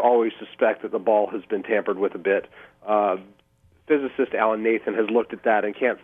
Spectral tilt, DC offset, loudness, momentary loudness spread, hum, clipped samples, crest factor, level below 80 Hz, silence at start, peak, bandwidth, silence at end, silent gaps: -8 dB/octave; under 0.1%; -23 LUFS; 4 LU; none; under 0.1%; 18 dB; -68 dBFS; 0 s; -6 dBFS; 3.8 kHz; 0.05 s; none